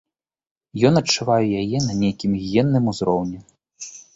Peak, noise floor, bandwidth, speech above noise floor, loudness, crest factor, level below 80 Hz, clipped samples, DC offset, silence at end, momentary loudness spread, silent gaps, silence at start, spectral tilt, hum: -2 dBFS; -40 dBFS; 8 kHz; 21 dB; -20 LUFS; 18 dB; -50 dBFS; under 0.1%; under 0.1%; 0.15 s; 18 LU; none; 0.75 s; -5.5 dB/octave; none